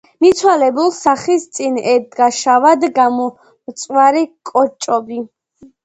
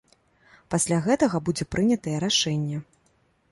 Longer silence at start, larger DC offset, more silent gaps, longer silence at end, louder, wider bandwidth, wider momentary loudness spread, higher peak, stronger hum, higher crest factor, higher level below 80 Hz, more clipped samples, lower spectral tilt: second, 0.2 s vs 0.7 s; neither; neither; second, 0.2 s vs 0.7 s; first, -14 LUFS vs -24 LUFS; second, 9 kHz vs 11.5 kHz; first, 12 LU vs 7 LU; first, 0 dBFS vs -8 dBFS; neither; about the same, 14 dB vs 18 dB; second, -60 dBFS vs -54 dBFS; neither; second, -3 dB/octave vs -4.5 dB/octave